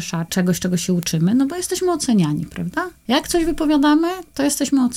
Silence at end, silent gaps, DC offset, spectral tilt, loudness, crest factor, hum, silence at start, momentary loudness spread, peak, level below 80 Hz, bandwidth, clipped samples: 0 s; none; under 0.1%; -5 dB/octave; -19 LUFS; 16 dB; none; 0 s; 8 LU; -2 dBFS; -42 dBFS; 18.5 kHz; under 0.1%